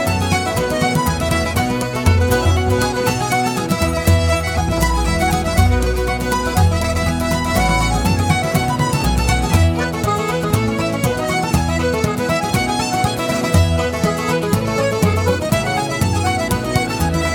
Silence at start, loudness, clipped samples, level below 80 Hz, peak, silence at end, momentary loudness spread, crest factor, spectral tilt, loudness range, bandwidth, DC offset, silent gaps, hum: 0 s; -17 LUFS; under 0.1%; -26 dBFS; 0 dBFS; 0 s; 3 LU; 16 dB; -5 dB/octave; 1 LU; 18.5 kHz; under 0.1%; none; none